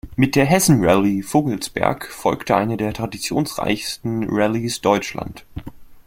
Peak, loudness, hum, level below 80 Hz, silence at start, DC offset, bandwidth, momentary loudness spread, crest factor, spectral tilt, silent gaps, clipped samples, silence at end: -2 dBFS; -19 LUFS; none; -44 dBFS; 0.05 s; under 0.1%; 16.5 kHz; 12 LU; 18 dB; -5 dB/octave; none; under 0.1%; 0.05 s